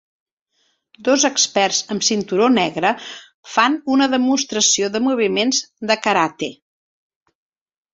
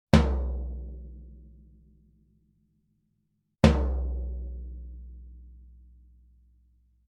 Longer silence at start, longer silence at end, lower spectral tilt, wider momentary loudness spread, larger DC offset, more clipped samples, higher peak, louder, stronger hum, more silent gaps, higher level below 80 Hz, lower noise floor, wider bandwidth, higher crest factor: first, 1 s vs 0.15 s; about the same, 1.4 s vs 1.5 s; second, -2 dB/octave vs -7 dB/octave; second, 8 LU vs 26 LU; neither; neither; about the same, -2 dBFS vs 0 dBFS; first, -17 LUFS vs -28 LUFS; neither; first, 3.34-3.43 s vs none; second, -62 dBFS vs -34 dBFS; second, -66 dBFS vs -75 dBFS; second, 8 kHz vs 10.5 kHz; second, 18 dB vs 30 dB